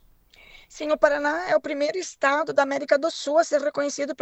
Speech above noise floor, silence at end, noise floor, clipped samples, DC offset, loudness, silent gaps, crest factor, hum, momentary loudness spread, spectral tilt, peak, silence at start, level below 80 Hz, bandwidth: 30 dB; 0.1 s; -54 dBFS; under 0.1%; under 0.1%; -23 LUFS; none; 22 dB; none; 6 LU; -2.5 dB/octave; -2 dBFS; 0.7 s; -60 dBFS; 8.4 kHz